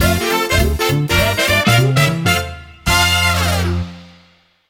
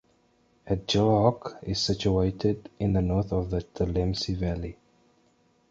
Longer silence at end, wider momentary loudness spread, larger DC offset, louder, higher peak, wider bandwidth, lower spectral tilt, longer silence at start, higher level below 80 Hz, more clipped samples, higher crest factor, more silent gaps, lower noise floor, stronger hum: second, 0.65 s vs 1 s; about the same, 9 LU vs 9 LU; neither; first, -14 LUFS vs -27 LUFS; first, -2 dBFS vs -6 dBFS; first, 17.5 kHz vs 7.8 kHz; second, -4 dB/octave vs -6.5 dB/octave; second, 0 s vs 0.65 s; first, -28 dBFS vs -40 dBFS; neither; second, 14 dB vs 22 dB; neither; second, -52 dBFS vs -65 dBFS; neither